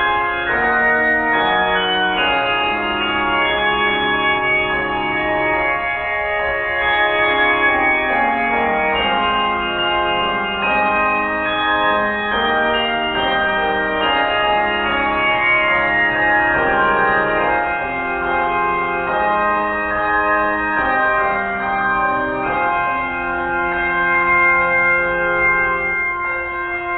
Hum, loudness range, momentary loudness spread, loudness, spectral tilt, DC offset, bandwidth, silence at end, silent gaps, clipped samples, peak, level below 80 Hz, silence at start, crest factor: none; 2 LU; 5 LU; -16 LUFS; -7.5 dB/octave; under 0.1%; 4.5 kHz; 0 s; none; under 0.1%; -4 dBFS; -40 dBFS; 0 s; 14 dB